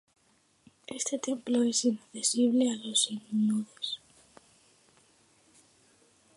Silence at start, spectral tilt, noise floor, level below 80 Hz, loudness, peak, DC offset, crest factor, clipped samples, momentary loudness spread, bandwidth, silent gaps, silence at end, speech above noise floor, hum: 0.9 s; -3 dB/octave; -68 dBFS; -80 dBFS; -29 LUFS; -14 dBFS; under 0.1%; 20 dB; under 0.1%; 11 LU; 11.5 kHz; none; 2.4 s; 39 dB; none